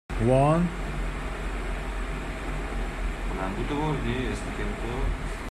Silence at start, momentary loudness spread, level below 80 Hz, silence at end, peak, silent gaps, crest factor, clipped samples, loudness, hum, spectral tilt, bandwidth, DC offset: 0.1 s; 11 LU; -32 dBFS; 0 s; -8 dBFS; none; 20 dB; under 0.1%; -29 LUFS; none; -6.5 dB/octave; 12.5 kHz; under 0.1%